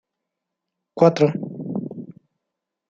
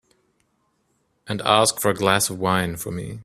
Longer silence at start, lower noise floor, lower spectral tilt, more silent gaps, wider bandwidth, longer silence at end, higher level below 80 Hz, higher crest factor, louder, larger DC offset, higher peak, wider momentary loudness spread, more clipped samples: second, 0.95 s vs 1.25 s; first, -82 dBFS vs -68 dBFS; first, -8 dB/octave vs -3.5 dB/octave; neither; second, 7.4 kHz vs 16 kHz; first, 0.8 s vs 0 s; second, -68 dBFS vs -54 dBFS; about the same, 22 dB vs 22 dB; about the same, -21 LUFS vs -21 LUFS; neither; about the same, -2 dBFS vs 0 dBFS; first, 21 LU vs 12 LU; neither